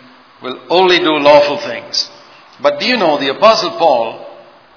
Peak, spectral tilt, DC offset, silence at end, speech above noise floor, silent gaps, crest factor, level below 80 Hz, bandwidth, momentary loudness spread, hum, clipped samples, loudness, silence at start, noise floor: 0 dBFS; -3.5 dB/octave; under 0.1%; 0.4 s; 26 dB; none; 14 dB; -60 dBFS; 5.4 kHz; 15 LU; none; 0.4%; -12 LUFS; 0.4 s; -38 dBFS